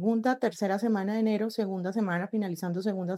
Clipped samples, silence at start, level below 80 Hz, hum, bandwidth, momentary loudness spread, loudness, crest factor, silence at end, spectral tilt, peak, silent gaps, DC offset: under 0.1%; 0 s; -88 dBFS; none; 14 kHz; 4 LU; -29 LUFS; 14 dB; 0 s; -7 dB/octave; -14 dBFS; none; under 0.1%